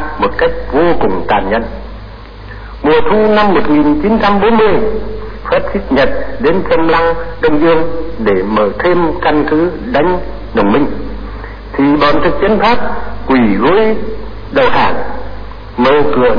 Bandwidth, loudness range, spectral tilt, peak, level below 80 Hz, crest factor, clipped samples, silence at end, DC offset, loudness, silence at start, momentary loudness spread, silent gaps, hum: 5.2 kHz; 2 LU; -8 dB/octave; -2 dBFS; -28 dBFS; 12 dB; under 0.1%; 0 s; 9%; -12 LUFS; 0 s; 16 LU; none; none